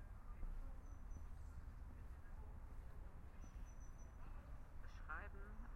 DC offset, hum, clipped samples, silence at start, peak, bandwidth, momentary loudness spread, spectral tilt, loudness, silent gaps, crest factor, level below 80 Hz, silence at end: under 0.1%; none; under 0.1%; 0 s; -36 dBFS; 12.5 kHz; 7 LU; -6.5 dB/octave; -58 LUFS; none; 16 dB; -54 dBFS; 0 s